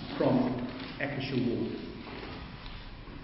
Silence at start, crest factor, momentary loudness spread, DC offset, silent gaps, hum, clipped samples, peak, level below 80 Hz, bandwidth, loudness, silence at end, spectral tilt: 0 s; 18 dB; 17 LU; under 0.1%; none; none; under 0.1%; -14 dBFS; -50 dBFS; 5.8 kHz; -33 LUFS; 0 s; -10.5 dB/octave